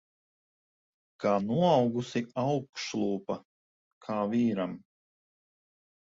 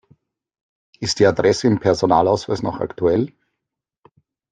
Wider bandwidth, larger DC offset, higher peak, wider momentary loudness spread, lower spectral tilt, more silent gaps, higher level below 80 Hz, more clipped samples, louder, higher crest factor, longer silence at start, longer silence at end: second, 7.8 kHz vs 9.6 kHz; neither; second, -12 dBFS vs -2 dBFS; first, 13 LU vs 9 LU; about the same, -6.5 dB/octave vs -5.5 dB/octave; first, 2.69-2.73 s, 3.45-4.01 s vs none; second, -70 dBFS vs -52 dBFS; neither; second, -30 LUFS vs -18 LUFS; about the same, 20 dB vs 18 dB; first, 1.2 s vs 1 s; about the same, 1.25 s vs 1.25 s